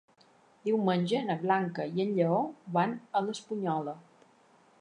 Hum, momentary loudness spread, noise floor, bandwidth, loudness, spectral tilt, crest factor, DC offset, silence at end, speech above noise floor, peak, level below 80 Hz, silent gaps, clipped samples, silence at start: none; 7 LU; -63 dBFS; 10 kHz; -31 LUFS; -7 dB/octave; 18 dB; under 0.1%; 0.8 s; 33 dB; -14 dBFS; -82 dBFS; none; under 0.1%; 0.65 s